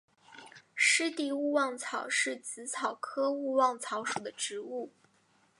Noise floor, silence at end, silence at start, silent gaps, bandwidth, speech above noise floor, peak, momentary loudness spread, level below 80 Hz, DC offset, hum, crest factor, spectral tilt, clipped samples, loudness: -69 dBFS; 0.7 s; 0.3 s; none; 11.5 kHz; 36 dB; -14 dBFS; 15 LU; -88 dBFS; under 0.1%; none; 20 dB; -1 dB/octave; under 0.1%; -31 LUFS